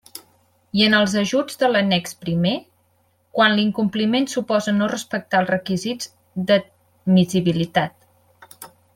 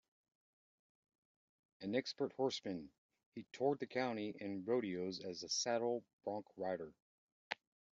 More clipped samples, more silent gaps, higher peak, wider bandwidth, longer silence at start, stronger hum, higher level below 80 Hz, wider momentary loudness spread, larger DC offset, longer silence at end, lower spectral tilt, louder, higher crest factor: neither; second, none vs 2.98-3.09 s, 3.26-3.32 s, 6.13-6.19 s, 7.02-7.51 s; first, -2 dBFS vs -22 dBFS; first, 16 kHz vs 7.4 kHz; second, 0.15 s vs 1.8 s; neither; first, -60 dBFS vs -86 dBFS; about the same, 13 LU vs 12 LU; neither; about the same, 0.3 s vs 0.4 s; first, -5 dB/octave vs -3.5 dB/octave; first, -20 LUFS vs -42 LUFS; about the same, 20 dB vs 22 dB